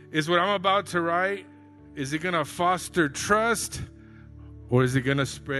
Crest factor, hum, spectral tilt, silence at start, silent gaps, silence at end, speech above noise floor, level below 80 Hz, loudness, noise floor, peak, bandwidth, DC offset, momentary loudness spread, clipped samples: 18 dB; none; -4.5 dB/octave; 0 s; none; 0 s; 21 dB; -52 dBFS; -25 LUFS; -46 dBFS; -8 dBFS; 12.5 kHz; under 0.1%; 13 LU; under 0.1%